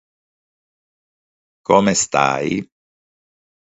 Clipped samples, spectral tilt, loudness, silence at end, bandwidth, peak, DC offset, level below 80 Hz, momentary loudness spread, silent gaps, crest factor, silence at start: under 0.1%; -4 dB/octave; -17 LUFS; 1 s; 8 kHz; 0 dBFS; under 0.1%; -56 dBFS; 11 LU; none; 22 dB; 1.7 s